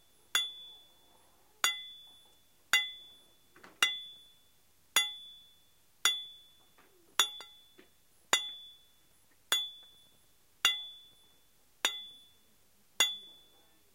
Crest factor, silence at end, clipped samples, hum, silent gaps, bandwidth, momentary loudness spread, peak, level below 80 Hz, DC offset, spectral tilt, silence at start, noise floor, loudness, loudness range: 30 dB; 0.65 s; under 0.1%; none; none; 16 kHz; 22 LU; -8 dBFS; -80 dBFS; under 0.1%; 2.5 dB/octave; 0.35 s; -69 dBFS; -32 LUFS; 3 LU